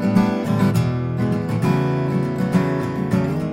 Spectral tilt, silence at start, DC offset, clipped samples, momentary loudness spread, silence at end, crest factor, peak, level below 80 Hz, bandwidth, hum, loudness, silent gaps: -8 dB/octave; 0 s; under 0.1%; under 0.1%; 4 LU; 0 s; 16 dB; -4 dBFS; -50 dBFS; 16 kHz; none; -20 LUFS; none